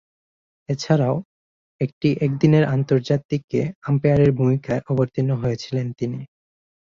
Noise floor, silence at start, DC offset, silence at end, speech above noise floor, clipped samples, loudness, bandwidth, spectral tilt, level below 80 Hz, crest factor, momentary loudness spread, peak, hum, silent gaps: under -90 dBFS; 0.7 s; under 0.1%; 0.7 s; over 70 dB; under 0.1%; -21 LUFS; 7.4 kHz; -8 dB/octave; -50 dBFS; 18 dB; 11 LU; -4 dBFS; none; 1.25-1.79 s, 1.93-2.01 s, 3.25-3.29 s, 3.44-3.48 s, 3.76-3.82 s